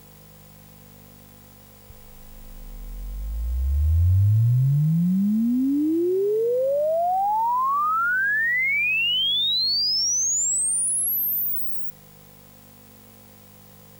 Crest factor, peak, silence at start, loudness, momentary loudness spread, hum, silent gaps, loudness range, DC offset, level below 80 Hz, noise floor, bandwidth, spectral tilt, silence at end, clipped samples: 10 dB; -14 dBFS; 1.9 s; -21 LUFS; 9 LU; 50 Hz at -45 dBFS; none; 6 LU; under 0.1%; -36 dBFS; -48 dBFS; over 20 kHz; -3.5 dB/octave; 2.1 s; under 0.1%